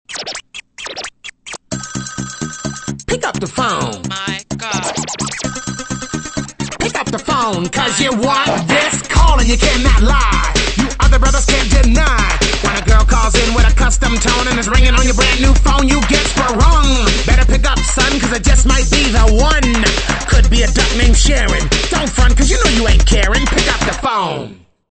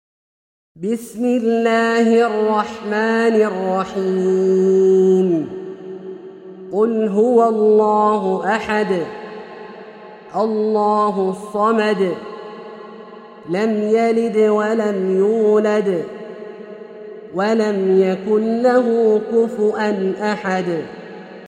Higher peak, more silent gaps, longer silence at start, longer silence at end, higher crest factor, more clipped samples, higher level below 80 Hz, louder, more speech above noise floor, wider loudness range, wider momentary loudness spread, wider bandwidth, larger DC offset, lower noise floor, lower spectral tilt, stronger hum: about the same, 0 dBFS vs -2 dBFS; neither; second, 0.1 s vs 0.75 s; first, 0.4 s vs 0 s; about the same, 12 dB vs 14 dB; neither; first, -14 dBFS vs -64 dBFS; first, -14 LUFS vs -17 LUFS; about the same, 21 dB vs 22 dB; first, 8 LU vs 3 LU; second, 12 LU vs 20 LU; second, 8.8 kHz vs 11 kHz; neither; second, -32 dBFS vs -38 dBFS; second, -3.5 dB/octave vs -6.5 dB/octave; neither